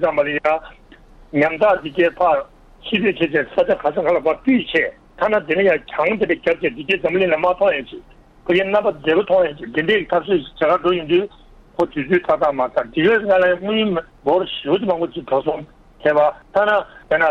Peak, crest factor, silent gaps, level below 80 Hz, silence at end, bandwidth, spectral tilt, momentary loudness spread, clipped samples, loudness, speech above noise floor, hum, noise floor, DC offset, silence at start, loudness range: -2 dBFS; 16 dB; none; -48 dBFS; 0 s; 6.6 kHz; -7 dB/octave; 7 LU; under 0.1%; -18 LUFS; 27 dB; none; -45 dBFS; under 0.1%; 0 s; 1 LU